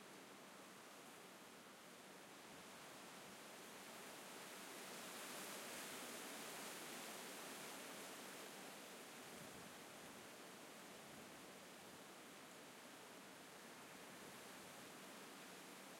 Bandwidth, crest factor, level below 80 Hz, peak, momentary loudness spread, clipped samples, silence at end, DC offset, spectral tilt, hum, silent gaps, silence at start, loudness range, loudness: 16.5 kHz; 18 dB; under -90 dBFS; -40 dBFS; 8 LU; under 0.1%; 0 s; under 0.1%; -2 dB/octave; none; none; 0 s; 6 LU; -55 LUFS